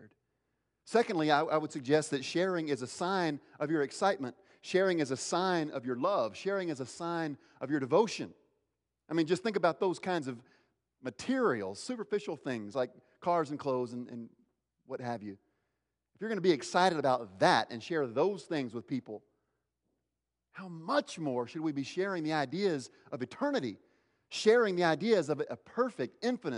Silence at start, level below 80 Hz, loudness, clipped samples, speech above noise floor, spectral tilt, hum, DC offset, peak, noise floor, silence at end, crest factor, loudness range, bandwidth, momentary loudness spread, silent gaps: 0 s; -82 dBFS; -33 LUFS; under 0.1%; 55 dB; -5 dB/octave; none; under 0.1%; -12 dBFS; -88 dBFS; 0 s; 22 dB; 6 LU; 11 kHz; 14 LU; none